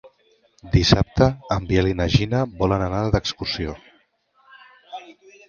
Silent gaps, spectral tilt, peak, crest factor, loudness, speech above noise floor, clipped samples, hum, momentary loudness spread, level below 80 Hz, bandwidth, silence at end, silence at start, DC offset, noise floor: none; -6 dB/octave; 0 dBFS; 22 dB; -21 LUFS; 42 dB; under 0.1%; none; 22 LU; -34 dBFS; 7.2 kHz; 0.35 s; 0.05 s; under 0.1%; -62 dBFS